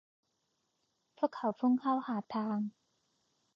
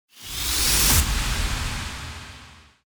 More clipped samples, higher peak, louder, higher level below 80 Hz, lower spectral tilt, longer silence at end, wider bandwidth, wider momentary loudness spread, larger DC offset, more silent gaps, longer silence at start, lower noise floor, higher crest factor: neither; second, -18 dBFS vs -4 dBFS; second, -34 LUFS vs -21 LUFS; second, -86 dBFS vs -30 dBFS; first, -6.5 dB/octave vs -2 dB/octave; first, 0.85 s vs 0.3 s; second, 5.8 kHz vs over 20 kHz; second, 7 LU vs 19 LU; neither; neither; first, 1.2 s vs 0.15 s; first, -81 dBFS vs -47 dBFS; about the same, 20 dB vs 20 dB